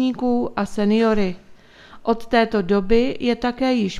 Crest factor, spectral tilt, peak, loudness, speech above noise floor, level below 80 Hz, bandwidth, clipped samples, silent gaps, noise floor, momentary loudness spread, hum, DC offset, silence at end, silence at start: 18 dB; -6.5 dB/octave; -2 dBFS; -20 LUFS; 26 dB; -42 dBFS; 11 kHz; under 0.1%; none; -45 dBFS; 7 LU; none; under 0.1%; 0 s; 0 s